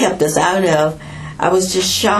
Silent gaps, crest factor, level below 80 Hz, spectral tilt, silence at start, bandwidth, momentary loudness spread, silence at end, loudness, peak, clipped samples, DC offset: none; 14 dB; -44 dBFS; -3.5 dB/octave; 0 s; 14.5 kHz; 9 LU; 0 s; -15 LUFS; 0 dBFS; under 0.1%; under 0.1%